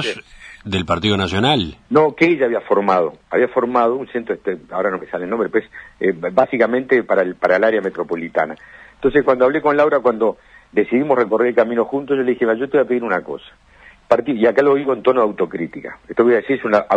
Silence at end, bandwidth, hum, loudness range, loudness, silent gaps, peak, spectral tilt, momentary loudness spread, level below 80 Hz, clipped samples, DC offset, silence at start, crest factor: 0 s; 9.8 kHz; none; 2 LU; -17 LUFS; none; 0 dBFS; -6.5 dB/octave; 9 LU; -50 dBFS; under 0.1%; under 0.1%; 0 s; 18 dB